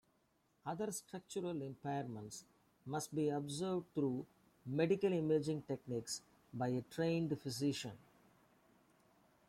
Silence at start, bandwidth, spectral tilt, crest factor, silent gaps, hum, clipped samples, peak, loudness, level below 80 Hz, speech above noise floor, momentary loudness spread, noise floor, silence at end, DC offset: 0.65 s; 16 kHz; -5.5 dB/octave; 18 dB; none; none; under 0.1%; -22 dBFS; -41 LUFS; -76 dBFS; 38 dB; 15 LU; -78 dBFS; 1.5 s; under 0.1%